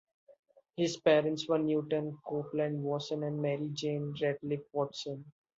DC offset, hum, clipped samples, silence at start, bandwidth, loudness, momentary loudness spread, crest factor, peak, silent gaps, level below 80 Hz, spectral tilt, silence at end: under 0.1%; none; under 0.1%; 0.75 s; 7.8 kHz; -33 LUFS; 10 LU; 20 dB; -14 dBFS; none; -76 dBFS; -6 dB/octave; 0.3 s